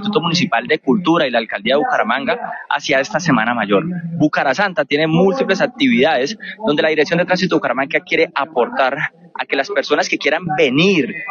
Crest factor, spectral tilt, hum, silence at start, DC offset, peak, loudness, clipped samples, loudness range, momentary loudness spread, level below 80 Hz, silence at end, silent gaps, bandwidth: 14 dB; -5 dB/octave; none; 0 s; under 0.1%; -2 dBFS; -16 LUFS; under 0.1%; 2 LU; 6 LU; -60 dBFS; 0 s; none; 7.2 kHz